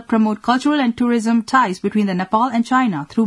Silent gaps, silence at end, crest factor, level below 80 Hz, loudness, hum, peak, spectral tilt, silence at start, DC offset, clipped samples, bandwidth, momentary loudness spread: none; 0 s; 16 dB; -58 dBFS; -17 LUFS; none; -2 dBFS; -6 dB/octave; 0.1 s; under 0.1%; under 0.1%; 11.5 kHz; 3 LU